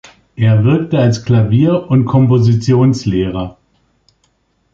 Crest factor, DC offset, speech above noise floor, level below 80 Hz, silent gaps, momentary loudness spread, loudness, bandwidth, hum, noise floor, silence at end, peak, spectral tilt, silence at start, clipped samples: 12 dB; under 0.1%; 49 dB; -40 dBFS; none; 6 LU; -12 LUFS; 7.6 kHz; none; -60 dBFS; 1.25 s; -2 dBFS; -8 dB/octave; 0.4 s; under 0.1%